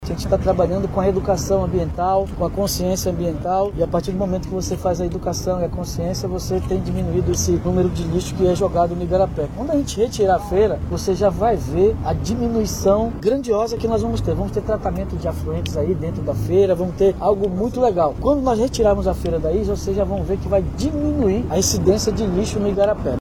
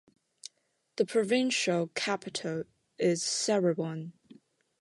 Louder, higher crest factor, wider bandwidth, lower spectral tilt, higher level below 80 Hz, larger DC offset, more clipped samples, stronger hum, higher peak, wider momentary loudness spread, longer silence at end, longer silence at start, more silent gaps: first, -20 LUFS vs -30 LUFS; about the same, 16 dB vs 18 dB; first, 18 kHz vs 11.5 kHz; first, -6 dB/octave vs -4 dB/octave; first, -30 dBFS vs -78 dBFS; neither; neither; neither; first, -4 dBFS vs -14 dBFS; second, 6 LU vs 20 LU; second, 0 s vs 0.7 s; second, 0 s vs 0.95 s; neither